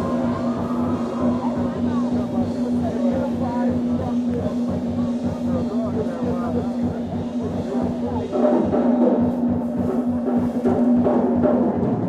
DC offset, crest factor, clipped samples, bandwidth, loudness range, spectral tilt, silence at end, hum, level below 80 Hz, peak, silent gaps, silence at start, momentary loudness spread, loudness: under 0.1%; 16 dB; under 0.1%; 7.8 kHz; 4 LU; -9 dB/octave; 0 s; none; -46 dBFS; -6 dBFS; none; 0 s; 6 LU; -22 LUFS